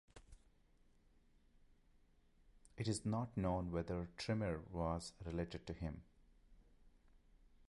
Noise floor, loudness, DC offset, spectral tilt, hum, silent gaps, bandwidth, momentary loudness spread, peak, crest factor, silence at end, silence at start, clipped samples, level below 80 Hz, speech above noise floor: -71 dBFS; -44 LUFS; under 0.1%; -6 dB/octave; none; none; 11 kHz; 7 LU; -28 dBFS; 18 dB; 0.55 s; 0.15 s; under 0.1%; -58 dBFS; 29 dB